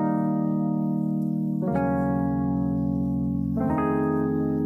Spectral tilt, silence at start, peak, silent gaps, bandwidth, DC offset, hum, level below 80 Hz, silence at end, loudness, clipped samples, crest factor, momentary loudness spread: -11.5 dB/octave; 0 s; -12 dBFS; none; 3.1 kHz; under 0.1%; none; -44 dBFS; 0 s; -25 LUFS; under 0.1%; 12 dB; 2 LU